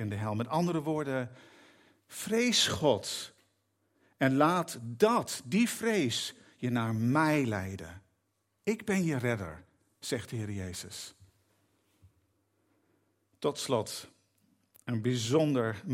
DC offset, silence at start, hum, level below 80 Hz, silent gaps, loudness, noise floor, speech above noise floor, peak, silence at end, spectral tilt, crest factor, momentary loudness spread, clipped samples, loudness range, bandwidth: under 0.1%; 0 s; none; -70 dBFS; none; -31 LUFS; -78 dBFS; 47 dB; -10 dBFS; 0 s; -4.5 dB/octave; 22 dB; 15 LU; under 0.1%; 12 LU; 16 kHz